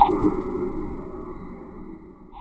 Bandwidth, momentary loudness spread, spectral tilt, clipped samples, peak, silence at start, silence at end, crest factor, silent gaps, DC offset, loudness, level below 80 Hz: 8 kHz; 19 LU; -9 dB/octave; under 0.1%; -2 dBFS; 0 s; 0 s; 24 dB; none; under 0.1%; -27 LUFS; -38 dBFS